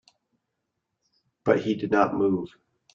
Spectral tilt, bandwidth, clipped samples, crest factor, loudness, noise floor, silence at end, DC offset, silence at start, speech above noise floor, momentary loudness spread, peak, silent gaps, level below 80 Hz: -7.5 dB/octave; 7.4 kHz; under 0.1%; 22 dB; -25 LUFS; -81 dBFS; 0.45 s; under 0.1%; 1.45 s; 57 dB; 8 LU; -6 dBFS; none; -64 dBFS